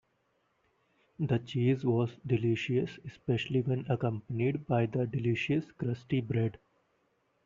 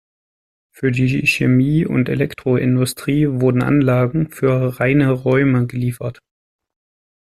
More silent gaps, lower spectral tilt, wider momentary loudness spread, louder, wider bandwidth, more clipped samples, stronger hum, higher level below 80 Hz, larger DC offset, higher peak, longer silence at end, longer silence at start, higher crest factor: neither; about the same, -7 dB/octave vs -7 dB/octave; about the same, 5 LU vs 6 LU; second, -32 LUFS vs -17 LUFS; second, 7.4 kHz vs 13.5 kHz; neither; neither; second, -64 dBFS vs -46 dBFS; neither; second, -16 dBFS vs -2 dBFS; second, 0.95 s vs 1.1 s; first, 1.2 s vs 0.8 s; about the same, 16 dB vs 14 dB